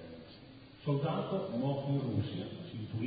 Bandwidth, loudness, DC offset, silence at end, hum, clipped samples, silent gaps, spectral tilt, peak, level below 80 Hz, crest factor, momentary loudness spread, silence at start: 4.9 kHz; -36 LUFS; under 0.1%; 0 s; none; under 0.1%; none; -7.5 dB/octave; -20 dBFS; -62 dBFS; 16 dB; 18 LU; 0 s